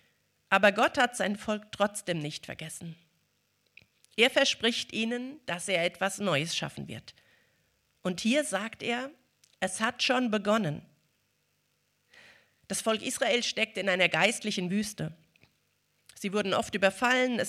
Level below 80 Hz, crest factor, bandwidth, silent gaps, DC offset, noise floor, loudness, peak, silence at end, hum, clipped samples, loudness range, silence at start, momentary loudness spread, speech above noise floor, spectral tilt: -70 dBFS; 24 dB; 15.5 kHz; none; under 0.1%; -74 dBFS; -29 LUFS; -8 dBFS; 0 s; 50 Hz at -65 dBFS; under 0.1%; 4 LU; 0.5 s; 15 LU; 45 dB; -3.5 dB/octave